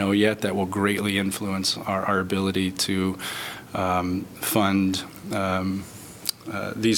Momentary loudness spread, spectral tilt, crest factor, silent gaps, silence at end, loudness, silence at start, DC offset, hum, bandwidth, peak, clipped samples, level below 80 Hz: 9 LU; -4.5 dB/octave; 20 dB; none; 0 s; -25 LUFS; 0 s; under 0.1%; none; 18 kHz; -4 dBFS; under 0.1%; -58 dBFS